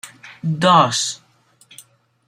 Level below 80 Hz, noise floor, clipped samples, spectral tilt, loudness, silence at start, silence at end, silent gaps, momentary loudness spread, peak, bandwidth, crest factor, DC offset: -64 dBFS; -54 dBFS; under 0.1%; -4 dB/octave; -17 LUFS; 0.05 s; 1.15 s; none; 21 LU; -2 dBFS; 15 kHz; 18 dB; under 0.1%